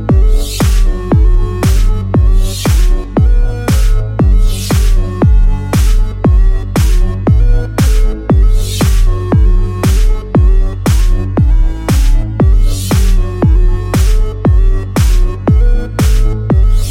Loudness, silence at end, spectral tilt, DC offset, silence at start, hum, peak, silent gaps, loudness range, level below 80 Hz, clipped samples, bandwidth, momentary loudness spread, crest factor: -13 LUFS; 0 s; -6.5 dB/octave; under 0.1%; 0 s; none; 0 dBFS; none; 0 LU; -10 dBFS; under 0.1%; 16 kHz; 3 LU; 8 dB